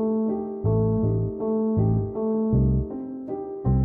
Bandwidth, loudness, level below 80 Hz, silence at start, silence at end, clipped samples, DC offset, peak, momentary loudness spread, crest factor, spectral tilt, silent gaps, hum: 2.1 kHz; -25 LUFS; -34 dBFS; 0 s; 0 s; under 0.1%; under 0.1%; -12 dBFS; 10 LU; 12 dB; -16 dB/octave; none; none